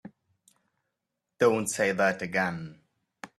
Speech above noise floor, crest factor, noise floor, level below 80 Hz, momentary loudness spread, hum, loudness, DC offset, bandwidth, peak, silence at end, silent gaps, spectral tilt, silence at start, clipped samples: 58 dB; 20 dB; -84 dBFS; -70 dBFS; 17 LU; none; -27 LUFS; under 0.1%; 14 kHz; -10 dBFS; 0.1 s; none; -4.5 dB/octave; 0.05 s; under 0.1%